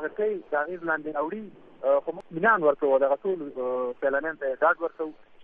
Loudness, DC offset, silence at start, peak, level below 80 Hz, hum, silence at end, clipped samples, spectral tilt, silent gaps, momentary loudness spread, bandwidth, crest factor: -26 LUFS; under 0.1%; 0 s; -8 dBFS; -66 dBFS; none; 0 s; under 0.1%; -8.5 dB/octave; none; 11 LU; 3.7 kHz; 18 dB